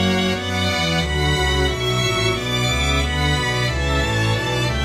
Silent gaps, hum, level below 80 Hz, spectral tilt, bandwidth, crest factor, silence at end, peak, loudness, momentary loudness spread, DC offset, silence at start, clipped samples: none; none; -28 dBFS; -4.5 dB/octave; 15 kHz; 14 dB; 0 s; -6 dBFS; -19 LUFS; 2 LU; under 0.1%; 0 s; under 0.1%